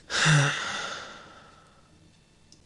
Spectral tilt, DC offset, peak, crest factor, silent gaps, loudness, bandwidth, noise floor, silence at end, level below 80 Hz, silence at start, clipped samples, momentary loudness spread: -3.5 dB/octave; under 0.1%; -8 dBFS; 20 dB; none; -25 LUFS; 11 kHz; -58 dBFS; 1.25 s; -60 dBFS; 0.1 s; under 0.1%; 22 LU